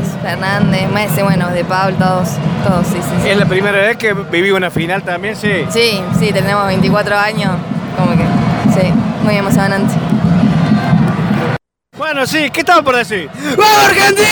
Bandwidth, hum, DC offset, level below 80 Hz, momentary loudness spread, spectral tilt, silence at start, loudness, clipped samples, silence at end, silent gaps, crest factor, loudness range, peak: over 20 kHz; none; under 0.1%; -38 dBFS; 7 LU; -5.5 dB/octave; 0 s; -12 LUFS; under 0.1%; 0 s; none; 12 dB; 1 LU; 0 dBFS